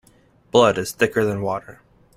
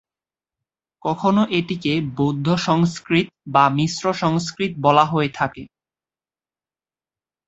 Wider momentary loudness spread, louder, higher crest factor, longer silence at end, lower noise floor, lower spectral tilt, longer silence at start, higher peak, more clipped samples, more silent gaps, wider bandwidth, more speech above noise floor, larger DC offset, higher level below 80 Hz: about the same, 10 LU vs 9 LU; about the same, -20 LUFS vs -20 LUFS; about the same, 20 dB vs 20 dB; second, 0.45 s vs 1.8 s; second, -55 dBFS vs under -90 dBFS; second, -4.5 dB/octave vs -6 dB/octave; second, 0.55 s vs 1.05 s; about the same, 0 dBFS vs -2 dBFS; neither; neither; first, 15.5 kHz vs 8 kHz; second, 36 dB vs over 71 dB; neither; about the same, -54 dBFS vs -56 dBFS